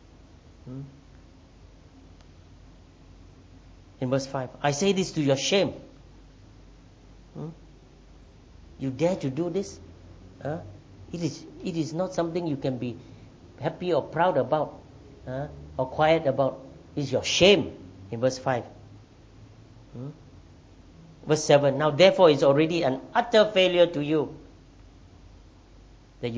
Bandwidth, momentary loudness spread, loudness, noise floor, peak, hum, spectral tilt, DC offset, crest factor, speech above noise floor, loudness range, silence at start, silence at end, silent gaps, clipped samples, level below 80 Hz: 8 kHz; 22 LU; -25 LUFS; -51 dBFS; -6 dBFS; none; -5 dB/octave; under 0.1%; 22 dB; 27 dB; 12 LU; 0.65 s; 0 s; none; under 0.1%; -54 dBFS